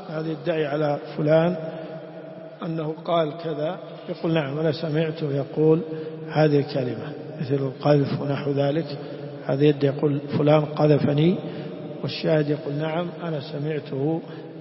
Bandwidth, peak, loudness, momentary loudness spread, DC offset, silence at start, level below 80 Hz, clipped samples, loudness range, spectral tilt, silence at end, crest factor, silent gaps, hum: 5.8 kHz; -4 dBFS; -24 LUFS; 14 LU; under 0.1%; 0 s; -66 dBFS; under 0.1%; 5 LU; -11.5 dB/octave; 0 s; 20 dB; none; none